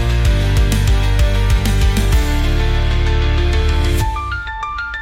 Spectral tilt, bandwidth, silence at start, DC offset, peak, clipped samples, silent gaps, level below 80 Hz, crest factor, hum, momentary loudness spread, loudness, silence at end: -5.5 dB/octave; 16 kHz; 0 s; under 0.1%; -4 dBFS; under 0.1%; none; -16 dBFS; 10 dB; none; 7 LU; -17 LUFS; 0 s